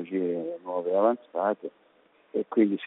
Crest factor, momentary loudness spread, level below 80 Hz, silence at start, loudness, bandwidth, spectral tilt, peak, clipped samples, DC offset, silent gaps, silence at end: 18 dB; 10 LU; -80 dBFS; 0 s; -28 LUFS; 4 kHz; -6 dB/octave; -10 dBFS; under 0.1%; under 0.1%; none; 0 s